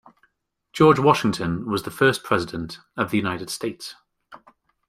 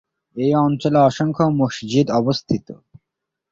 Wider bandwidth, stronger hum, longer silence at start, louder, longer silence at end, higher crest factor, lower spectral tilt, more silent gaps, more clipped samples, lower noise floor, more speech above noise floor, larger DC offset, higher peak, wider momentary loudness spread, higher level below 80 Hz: first, 16 kHz vs 7.6 kHz; neither; first, 0.75 s vs 0.35 s; second, -22 LUFS vs -18 LUFS; second, 0.5 s vs 0.75 s; first, 22 dB vs 16 dB; second, -5.5 dB/octave vs -7 dB/octave; neither; neither; second, -69 dBFS vs -82 dBFS; second, 48 dB vs 64 dB; neither; about the same, -2 dBFS vs -4 dBFS; first, 17 LU vs 8 LU; about the same, -54 dBFS vs -54 dBFS